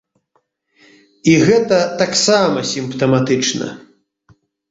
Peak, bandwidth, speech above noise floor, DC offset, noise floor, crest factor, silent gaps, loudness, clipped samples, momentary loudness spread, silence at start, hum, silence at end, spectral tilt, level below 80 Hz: -2 dBFS; 8 kHz; 50 dB; under 0.1%; -65 dBFS; 16 dB; none; -15 LUFS; under 0.1%; 8 LU; 1.25 s; none; 0.9 s; -4.5 dB/octave; -54 dBFS